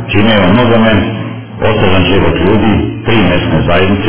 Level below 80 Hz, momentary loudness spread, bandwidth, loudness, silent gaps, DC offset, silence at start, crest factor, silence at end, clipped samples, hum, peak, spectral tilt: -24 dBFS; 7 LU; 4 kHz; -9 LUFS; none; 9%; 0 s; 10 dB; 0 s; 0.4%; none; 0 dBFS; -10.5 dB/octave